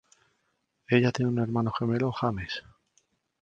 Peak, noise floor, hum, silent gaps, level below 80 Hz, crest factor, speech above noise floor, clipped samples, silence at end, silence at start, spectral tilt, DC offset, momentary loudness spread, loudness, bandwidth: -8 dBFS; -76 dBFS; none; none; -56 dBFS; 22 dB; 49 dB; under 0.1%; 0.8 s; 0.9 s; -7 dB/octave; under 0.1%; 11 LU; -28 LUFS; 7.6 kHz